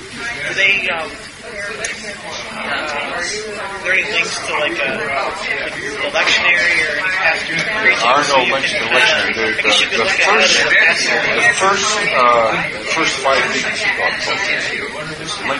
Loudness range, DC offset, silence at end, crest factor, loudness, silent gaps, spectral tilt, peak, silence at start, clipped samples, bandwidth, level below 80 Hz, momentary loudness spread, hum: 7 LU; under 0.1%; 0 s; 16 dB; -14 LUFS; none; -1.5 dB/octave; 0 dBFS; 0 s; under 0.1%; 11.5 kHz; -48 dBFS; 12 LU; none